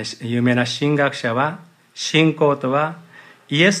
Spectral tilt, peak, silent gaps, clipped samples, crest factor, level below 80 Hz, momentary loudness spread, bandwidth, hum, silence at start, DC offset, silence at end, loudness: -5 dB/octave; -2 dBFS; none; under 0.1%; 18 dB; -68 dBFS; 9 LU; 12.5 kHz; none; 0 s; under 0.1%; 0 s; -19 LUFS